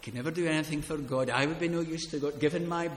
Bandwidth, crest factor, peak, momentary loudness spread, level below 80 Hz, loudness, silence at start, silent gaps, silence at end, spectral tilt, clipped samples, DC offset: 16 kHz; 20 dB; -10 dBFS; 5 LU; -56 dBFS; -31 LUFS; 0 s; none; 0 s; -5.5 dB/octave; under 0.1%; under 0.1%